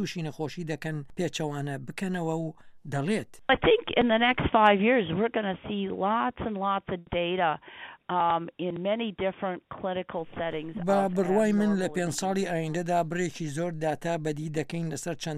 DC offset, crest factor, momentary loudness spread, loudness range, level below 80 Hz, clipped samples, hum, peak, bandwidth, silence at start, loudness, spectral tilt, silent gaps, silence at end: under 0.1%; 22 dB; 11 LU; 6 LU; -54 dBFS; under 0.1%; none; -6 dBFS; 14.5 kHz; 0 s; -28 LUFS; -5.5 dB/octave; none; 0 s